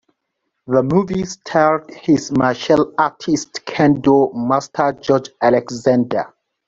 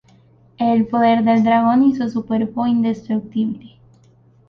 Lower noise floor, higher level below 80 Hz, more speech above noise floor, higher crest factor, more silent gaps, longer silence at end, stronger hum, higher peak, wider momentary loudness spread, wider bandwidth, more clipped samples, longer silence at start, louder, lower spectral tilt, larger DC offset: first, -74 dBFS vs -52 dBFS; about the same, -52 dBFS vs -56 dBFS; first, 58 dB vs 35 dB; about the same, 16 dB vs 14 dB; neither; second, 0.4 s vs 0.8 s; neither; about the same, -2 dBFS vs -4 dBFS; about the same, 7 LU vs 9 LU; first, 7.8 kHz vs 6.2 kHz; neither; about the same, 0.7 s vs 0.6 s; about the same, -17 LUFS vs -17 LUFS; second, -6 dB/octave vs -8 dB/octave; neither